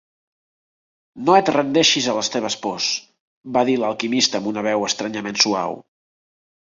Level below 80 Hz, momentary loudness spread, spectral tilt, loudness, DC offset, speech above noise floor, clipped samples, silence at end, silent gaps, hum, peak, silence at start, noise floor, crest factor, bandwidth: -66 dBFS; 9 LU; -2.5 dB/octave; -19 LUFS; under 0.1%; over 70 dB; under 0.1%; 0.85 s; 3.20-3.42 s; none; -2 dBFS; 1.15 s; under -90 dBFS; 20 dB; 7.8 kHz